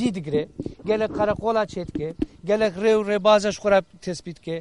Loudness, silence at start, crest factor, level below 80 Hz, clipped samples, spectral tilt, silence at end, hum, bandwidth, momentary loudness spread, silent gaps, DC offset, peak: -23 LUFS; 0 s; 18 dB; -48 dBFS; under 0.1%; -5.5 dB/octave; 0 s; none; 11.5 kHz; 14 LU; none; 0.1%; -4 dBFS